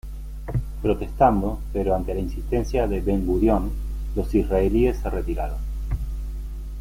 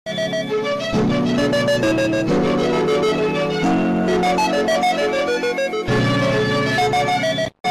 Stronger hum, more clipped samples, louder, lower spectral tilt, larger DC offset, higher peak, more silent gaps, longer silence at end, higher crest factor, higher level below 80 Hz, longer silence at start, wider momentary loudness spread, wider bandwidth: neither; neither; second, -24 LUFS vs -18 LUFS; first, -8.5 dB/octave vs -5.5 dB/octave; neither; first, -6 dBFS vs -10 dBFS; second, none vs 7.60-7.64 s; about the same, 0 s vs 0 s; first, 18 dB vs 8 dB; first, -28 dBFS vs -44 dBFS; about the same, 0.05 s vs 0.05 s; first, 12 LU vs 4 LU; about the same, 15.5 kHz vs 14.5 kHz